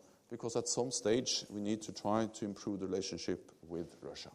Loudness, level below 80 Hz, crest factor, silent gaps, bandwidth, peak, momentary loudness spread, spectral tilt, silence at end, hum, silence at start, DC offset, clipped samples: -38 LUFS; -72 dBFS; 20 dB; none; 14 kHz; -20 dBFS; 12 LU; -3.5 dB/octave; 0 s; none; 0.3 s; under 0.1%; under 0.1%